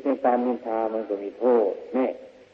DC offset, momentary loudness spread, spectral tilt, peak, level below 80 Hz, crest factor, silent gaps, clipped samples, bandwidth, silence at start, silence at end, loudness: under 0.1%; 8 LU; -8 dB/octave; -10 dBFS; -70 dBFS; 16 dB; none; under 0.1%; 5.6 kHz; 0 s; 0.25 s; -25 LUFS